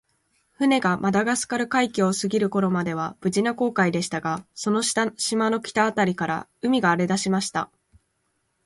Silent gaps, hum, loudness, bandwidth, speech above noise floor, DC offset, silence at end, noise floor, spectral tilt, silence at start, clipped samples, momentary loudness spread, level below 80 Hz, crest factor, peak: none; none; -23 LUFS; 11.5 kHz; 50 dB; under 0.1%; 1 s; -72 dBFS; -4.5 dB/octave; 0.6 s; under 0.1%; 7 LU; -62 dBFS; 18 dB; -6 dBFS